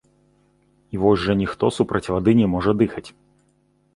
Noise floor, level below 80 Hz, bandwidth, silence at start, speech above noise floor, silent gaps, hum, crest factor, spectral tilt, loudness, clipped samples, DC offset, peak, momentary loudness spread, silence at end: -62 dBFS; -44 dBFS; 11.5 kHz; 0.95 s; 43 dB; none; 50 Hz at -45 dBFS; 18 dB; -7.5 dB/octave; -20 LUFS; under 0.1%; under 0.1%; -4 dBFS; 5 LU; 0.85 s